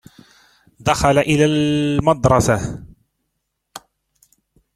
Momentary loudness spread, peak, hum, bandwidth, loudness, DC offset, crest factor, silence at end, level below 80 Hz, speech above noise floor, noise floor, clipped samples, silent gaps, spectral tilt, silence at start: 24 LU; 0 dBFS; none; 15.5 kHz; -16 LUFS; under 0.1%; 18 dB; 1 s; -40 dBFS; 58 dB; -74 dBFS; under 0.1%; none; -5.5 dB/octave; 0.8 s